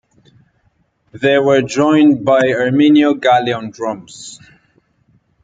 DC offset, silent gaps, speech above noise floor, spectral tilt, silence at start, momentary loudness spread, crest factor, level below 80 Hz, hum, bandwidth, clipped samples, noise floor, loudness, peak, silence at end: under 0.1%; none; 47 dB; -5.5 dB/octave; 1.15 s; 16 LU; 14 dB; -58 dBFS; none; 9 kHz; under 0.1%; -60 dBFS; -13 LUFS; -2 dBFS; 1.1 s